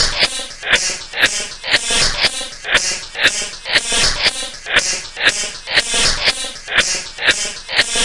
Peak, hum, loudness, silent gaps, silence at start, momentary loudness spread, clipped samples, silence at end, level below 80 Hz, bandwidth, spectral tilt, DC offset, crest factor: 0 dBFS; none; -15 LUFS; none; 0 s; 7 LU; under 0.1%; 0 s; -34 dBFS; 12 kHz; 0.5 dB/octave; 0.2%; 18 dB